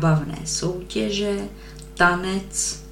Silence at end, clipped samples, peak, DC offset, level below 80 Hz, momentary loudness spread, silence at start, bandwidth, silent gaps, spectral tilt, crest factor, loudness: 0 s; under 0.1%; -4 dBFS; under 0.1%; -42 dBFS; 13 LU; 0 s; 16 kHz; none; -4 dB/octave; 20 dB; -23 LUFS